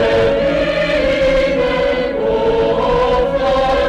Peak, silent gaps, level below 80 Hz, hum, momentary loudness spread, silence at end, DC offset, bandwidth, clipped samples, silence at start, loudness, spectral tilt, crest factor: -4 dBFS; none; -30 dBFS; none; 2 LU; 0 s; under 0.1%; 9.4 kHz; under 0.1%; 0 s; -15 LUFS; -6 dB/octave; 10 dB